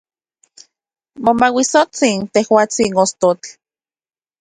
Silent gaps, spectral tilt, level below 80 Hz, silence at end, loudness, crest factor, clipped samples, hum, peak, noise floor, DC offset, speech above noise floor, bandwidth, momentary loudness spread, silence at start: none; -3.5 dB/octave; -56 dBFS; 0.9 s; -15 LUFS; 18 dB; under 0.1%; none; 0 dBFS; under -90 dBFS; under 0.1%; over 76 dB; 11 kHz; 5 LU; 1.2 s